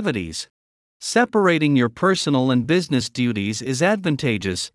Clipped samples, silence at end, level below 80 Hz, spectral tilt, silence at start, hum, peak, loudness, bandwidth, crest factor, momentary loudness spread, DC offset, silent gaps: under 0.1%; 0.05 s; -58 dBFS; -5 dB/octave; 0 s; none; -4 dBFS; -20 LUFS; 12 kHz; 16 dB; 9 LU; under 0.1%; 0.50-1.00 s